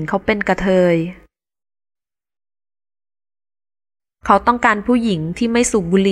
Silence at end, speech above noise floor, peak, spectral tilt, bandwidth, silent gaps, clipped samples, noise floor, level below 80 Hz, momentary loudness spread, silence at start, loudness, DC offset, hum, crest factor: 0 s; over 74 dB; 0 dBFS; -5.5 dB/octave; 13.5 kHz; none; under 0.1%; under -90 dBFS; -42 dBFS; 6 LU; 0 s; -16 LUFS; under 0.1%; none; 18 dB